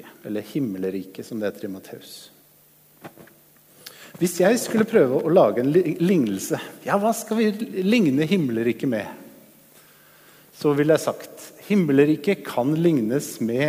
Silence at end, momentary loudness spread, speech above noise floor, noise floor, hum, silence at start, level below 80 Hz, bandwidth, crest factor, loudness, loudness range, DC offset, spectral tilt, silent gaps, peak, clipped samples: 0 s; 19 LU; 34 dB; -55 dBFS; none; 0.05 s; -68 dBFS; 16 kHz; 18 dB; -22 LUFS; 11 LU; under 0.1%; -6 dB/octave; none; -4 dBFS; under 0.1%